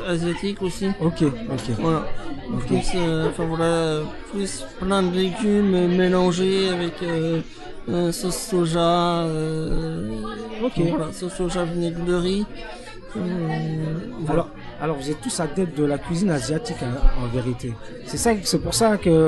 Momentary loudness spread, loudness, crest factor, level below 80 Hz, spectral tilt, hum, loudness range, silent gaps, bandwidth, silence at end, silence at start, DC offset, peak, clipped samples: 11 LU; -23 LUFS; 18 dB; -34 dBFS; -5.5 dB/octave; none; 5 LU; none; 12.5 kHz; 0 s; 0 s; under 0.1%; -4 dBFS; under 0.1%